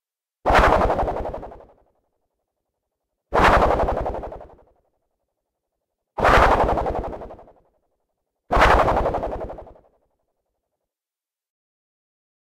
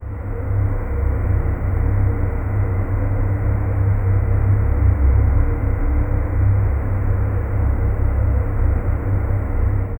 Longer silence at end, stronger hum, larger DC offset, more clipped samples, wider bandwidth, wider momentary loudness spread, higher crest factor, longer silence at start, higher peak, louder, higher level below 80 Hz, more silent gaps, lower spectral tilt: first, 2.85 s vs 0 s; neither; neither; neither; first, 15.5 kHz vs 2.6 kHz; first, 20 LU vs 4 LU; first, 20 dB vs 12 dB; first, 0.45 s vs 0 s; about the same, -4 dBFS vs -4 dBFS; about the same, -19 LUFS vs -20 LUFS; second, -32 dBFS vs -20 dBFS; neither; second, -5.5 dB/octave vs -11.5 dB/octave